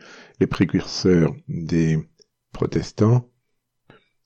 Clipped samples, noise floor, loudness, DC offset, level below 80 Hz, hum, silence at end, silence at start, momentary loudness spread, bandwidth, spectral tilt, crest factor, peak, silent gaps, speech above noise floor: under 0.1%; -72 dBFS; -21 LUFS; under 0.1%; -46 dBFS; none; 1.05 s; 0.1 s; 7 LU; 8 kHz; -7 dB/octave; 18 dB; -6 dBFS; none; 53 dB